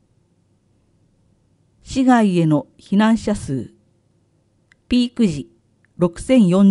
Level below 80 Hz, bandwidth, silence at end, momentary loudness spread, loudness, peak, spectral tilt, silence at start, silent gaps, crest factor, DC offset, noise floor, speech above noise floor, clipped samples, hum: -46 dBFS; 11.5 kHz; 0 s; 13 LU; -18 LUFS; -2 dBFS; -7 dB/octave; 1.85 s; none; 16 dB; under 0.1%; -61 dBFS; 45 dB; under 0.1%; none